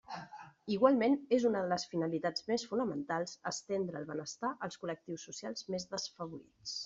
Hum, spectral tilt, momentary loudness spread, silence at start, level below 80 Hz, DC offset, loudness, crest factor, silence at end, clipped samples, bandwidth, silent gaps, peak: none; -4 dB/octave; 15 LU; 0.1 s; -76 dBFS; under 0.1%; -35 LUFS; 22 dB; 0 s; under 0.1%; 7.8 kHz; none; -14 dBFS